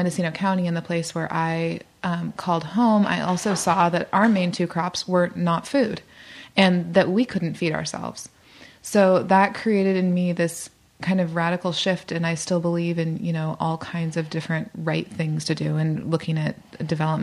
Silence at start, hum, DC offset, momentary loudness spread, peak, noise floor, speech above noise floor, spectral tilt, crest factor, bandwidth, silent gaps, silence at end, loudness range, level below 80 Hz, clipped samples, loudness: 0 s; none; under 0.1%; 10 LU; -4 dBFS; -47 dBFS; 25 dB; -5.5 dB/octave; 18 dB; 14 kHz; none; 0 s; 4 LU; -60 dBFS; under 0.1%; -23 LUFS